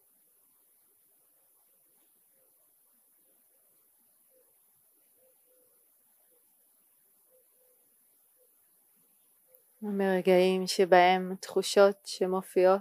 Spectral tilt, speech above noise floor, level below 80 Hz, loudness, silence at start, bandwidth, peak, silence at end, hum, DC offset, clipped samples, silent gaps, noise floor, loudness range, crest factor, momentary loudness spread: -5 dB/octave; 42 dB; under -90 dBFS; -26 LUFS; 9.8 s; 15.5 kHz; -8 dBFS; 0 s; none; under 0.1%; under 0.1%; none; -67 dBFS; 12 LU; 24 dB; 11 LU